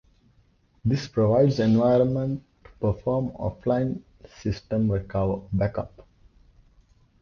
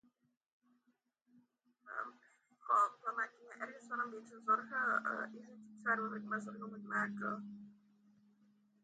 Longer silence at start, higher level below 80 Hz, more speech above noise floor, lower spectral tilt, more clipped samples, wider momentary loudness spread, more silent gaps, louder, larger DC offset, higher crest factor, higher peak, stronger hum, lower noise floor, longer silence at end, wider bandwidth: second, 0.85 s vs 1.85 s; first, -46 dBFS vs under -90 dBFS; about the same, 38 dB vs 40 dB; first, -8.5 dB/octave vs -5.5 dB/octave; neither; second, 12 LU vs 15 LU; neither; first, -25 LUFS vs -39 LUFS; neither; about the same, 18 dB vs 20 dB; first, -8 dBFS vs -22 dBFS; neither; second, -62 dBFS vs -81 dBFS; about the same, 1.2 s vs 1.1 s; second, 7 kHz vs 9 kHz